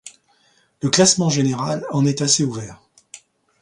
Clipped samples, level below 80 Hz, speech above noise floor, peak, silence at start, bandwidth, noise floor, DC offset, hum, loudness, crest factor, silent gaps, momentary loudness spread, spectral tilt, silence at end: under 0.1%; -58 dBFS; 42 dB; 0 dBFS; 0.05 s; 11.5 kHz; -60 dBFS; under 0.1%; none; -18 LUFS; 20 dB; none; 12 LU; -4 dB/octave; 0.45 s